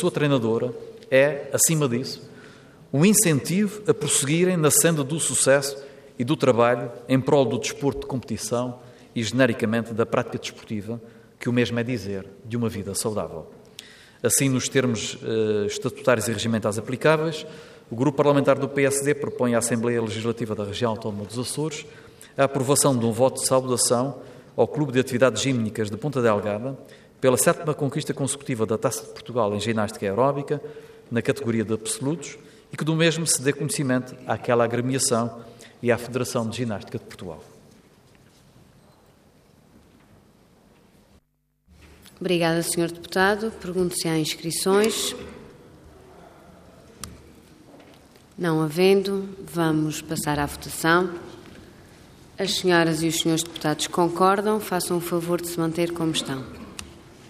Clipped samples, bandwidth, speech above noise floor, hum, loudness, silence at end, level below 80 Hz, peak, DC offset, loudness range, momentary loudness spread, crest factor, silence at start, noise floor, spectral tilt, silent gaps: under 0.1%; 15.5 kHz; 44 dB; none; -23 LUFS; 0 s; -58 dBFS; -6 dBFS; under 0.1%; 7 LU; 15 LU; 18 dB; 0 s; -67 dBFS; -4.5 dB/octave; none